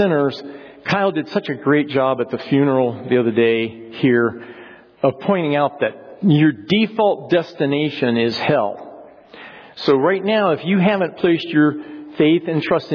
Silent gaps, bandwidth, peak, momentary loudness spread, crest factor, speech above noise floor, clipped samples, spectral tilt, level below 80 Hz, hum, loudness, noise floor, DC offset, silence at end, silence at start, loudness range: none; 5.4 kHz; -4 dBFS; 11 LU; 14 dB; 23 dB; under 0.1%; -8 dB/octave; -62 dBFS; none; -18 LUFS; -40 dBFS; under 0.1%; 0 s; 0 s; 2 LU